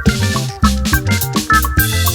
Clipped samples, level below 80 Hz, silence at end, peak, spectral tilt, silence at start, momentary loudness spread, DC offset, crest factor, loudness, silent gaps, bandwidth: under 0.1%; -22 dBFS; 0 s; 0 dBFS; -4 dB/octave; 0 s; 4 LU; under 0.1%; 14 dB; -14 LUFS; none; over 20 kHz